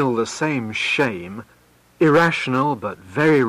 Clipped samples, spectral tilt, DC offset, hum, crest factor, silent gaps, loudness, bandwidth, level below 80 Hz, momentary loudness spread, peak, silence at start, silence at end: under 0.1%; -5.5 dB/octave; under 0.1%; none; 12 dB; none; -19 LUFS; 15 kHz; -58 dBFS; 13 LU; -8 dBFS; 0 s; 0 s